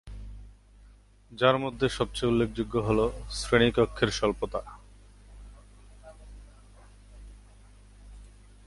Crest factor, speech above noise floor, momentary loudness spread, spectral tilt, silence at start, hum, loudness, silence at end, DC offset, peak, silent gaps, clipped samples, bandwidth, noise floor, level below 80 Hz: 24 dB; 29 dB; 22 LU; -5.5 dB/octave; 0.05 s; 50 Hz at -45 dBFS; -27 LUFS; 0.4 s; under 0.1%; -8 dBFS; none; under 0.1%; 11.5 kHz; -55 dBFS; -46 dBFS